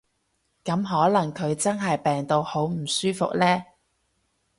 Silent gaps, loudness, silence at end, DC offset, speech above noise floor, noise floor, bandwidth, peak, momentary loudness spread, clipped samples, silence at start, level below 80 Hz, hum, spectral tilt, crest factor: none; -24 LUFS; 0.95 s; under 0.1%; 49 dB; -72 dBFS; 11.5 kHz; -8 dBFS; 6 LU; under 0.1%; 0.65 s; -62 dBFS; none; -5 dB/octave; 18 dB